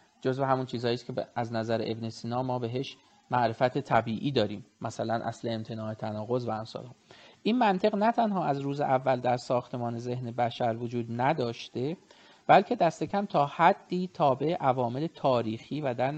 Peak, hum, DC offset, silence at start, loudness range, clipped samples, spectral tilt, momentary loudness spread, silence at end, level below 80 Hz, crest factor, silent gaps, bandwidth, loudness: -8 dBFS; none; under 0.1%; 0.25 s; 5 LU; under 0.1%; -7 dB/octave; 10 LU; 0 s; -68 dBFS; 22 dB; none; 8.6 kHz; -29 LUFS